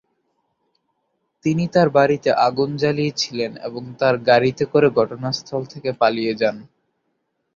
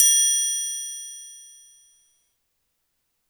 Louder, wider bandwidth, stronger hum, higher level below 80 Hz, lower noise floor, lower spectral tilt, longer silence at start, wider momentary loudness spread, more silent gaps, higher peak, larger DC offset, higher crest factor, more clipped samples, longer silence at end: about the same, -19 LUFS vs -20 LUFS; second, 7.4 kHz vs over 20 kHz; neither; first, -60 dBFS vs -80 dBFS; about the same, -72 dBFS vs -75 dBFS; first, -5.5 dB/octave vs 8.5 dB/octave; first, 1.45 s vs 0 s; second, 11 LU vs 24 LU; neither; about the same, -2 dBFS vs -4 dBFS; neither; about the same, 18 dB vs 22 dB; neither; second, 0.95 s vs 1.85 s